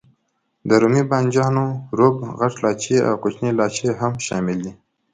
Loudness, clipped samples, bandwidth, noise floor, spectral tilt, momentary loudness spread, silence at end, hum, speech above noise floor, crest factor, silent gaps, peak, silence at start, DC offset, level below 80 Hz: -19 LUFS; under 0.1%; 9.4 kHz; -70 dBFS; -6 dB/octave; 7 LU; 0.4 s; none; 51 dB; 20 dB; none; 0 dBFS; 0.65 s; under 0.1%; -56 dBFS